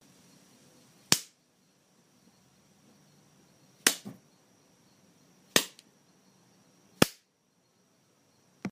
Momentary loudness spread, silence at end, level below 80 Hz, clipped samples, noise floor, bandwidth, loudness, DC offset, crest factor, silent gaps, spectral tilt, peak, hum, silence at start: 16 LU; 0 s; -68 dBFS; under 0.1%; -71 dBFS; 15.5 kHz; -29 LUFS; under 0.1%; 36 dB; none; -2 dB/octave; -2 dBFS; none; 1.1 s